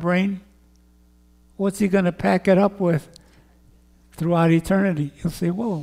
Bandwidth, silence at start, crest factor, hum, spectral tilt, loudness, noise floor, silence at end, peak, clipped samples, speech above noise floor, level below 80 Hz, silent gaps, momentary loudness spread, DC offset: 15.5 kHz; 0 s; 16 dB; none; -7.5 dB/octave; -21 LUFS; -54 dBFS; 0 s; -6 dBFS; under 0.1%; 34 dB; -50 dBFS; none; 9 LU; under 0.1%